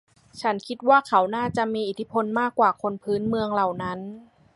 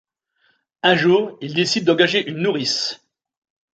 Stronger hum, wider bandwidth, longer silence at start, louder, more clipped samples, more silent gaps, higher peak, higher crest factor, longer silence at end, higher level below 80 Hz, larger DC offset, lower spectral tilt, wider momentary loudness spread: neither; first, 11.5 kHz vs 9 kHz; second, 0.35 s vs 0.85 s; second, -24 LUFS vs -18 LUFS; neither; neither; second, -6 dBFS vs -2 dBFS; about the same, 20 dB vs 18 dB; second, 0.35 s vs 0.8 s; first, -60 dBFS vs -66 dBFS; neither; first, -6 dB/octave vs -4 dB/octave; about the same, 10 LU vs 8 LU